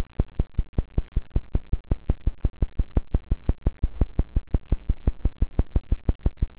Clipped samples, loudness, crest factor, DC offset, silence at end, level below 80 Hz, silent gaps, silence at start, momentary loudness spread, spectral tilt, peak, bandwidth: under 0.1%; -29 LUFS; 14 dB; 0.6%; 0.05 s; -26 dBFS; 0.69-0.73 s, 6.15-6.19 s; 0 s; 3 LU; -12 dB/octave; -10 dBFS; 4 kHz